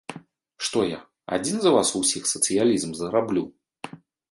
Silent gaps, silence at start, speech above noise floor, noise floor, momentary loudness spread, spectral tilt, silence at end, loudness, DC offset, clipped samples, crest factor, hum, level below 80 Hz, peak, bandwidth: none; 0.1 s; 23 dB; -46 dBFS; 21 LU; -3.5 dB/octave; 0.35 s; -23 LUFS; under 0.1%; under 0.1%; 18 dB; none; -62 dBFS; -6 dBFS; 12 kHz